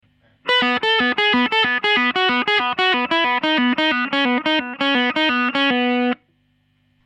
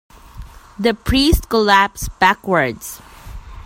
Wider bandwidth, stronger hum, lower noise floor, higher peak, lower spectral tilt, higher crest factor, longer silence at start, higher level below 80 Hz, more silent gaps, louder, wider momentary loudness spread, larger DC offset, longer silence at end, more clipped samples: second, 9 kHz vs 16.5 kHz; neither; first, -63 dBFS vs -37 dBFS; second, -6 dBFS vs 0 dBFS; about the same, -3.5 dB/octave vs -4.5 dB/octave; about the same, 14 dB vs 18 dB; about the same, 0.45 s vs 0.35 s; second, -62 dBFS vs -30 dBFS; neither; about the same, -17 LUFS vs -16 LUFS; second, 3 LU vs 18 LU; neither; first, 0.9 s vs 0.05 s; neither